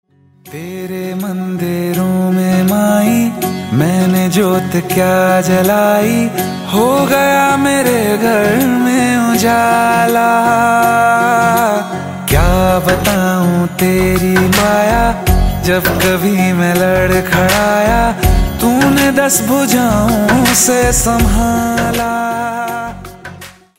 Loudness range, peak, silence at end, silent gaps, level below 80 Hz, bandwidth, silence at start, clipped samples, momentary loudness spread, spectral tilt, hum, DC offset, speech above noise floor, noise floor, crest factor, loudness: 2 LU; 0 dBFS; 0.3 s; none; -24 dBFS; 16.5 kHz; 0.45 s; under 0.1%; 8 LU; -5 dB/octave; none; under 0.1%; 23 dB; -34 dBFS; 12 dB; -12 LUFS